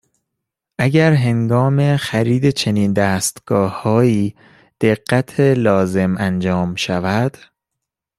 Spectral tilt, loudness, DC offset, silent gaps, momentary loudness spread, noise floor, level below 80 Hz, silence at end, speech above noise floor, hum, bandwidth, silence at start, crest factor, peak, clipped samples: -6 dB/octave; -16 LUFS; under 0.1%; none; 6 LU; -80 dBFS; -52 dBFS; 0.9 s; 65 dB; none; 14 kHz; 0.8 s; 14 dB; -2 dBFS; under 0.1%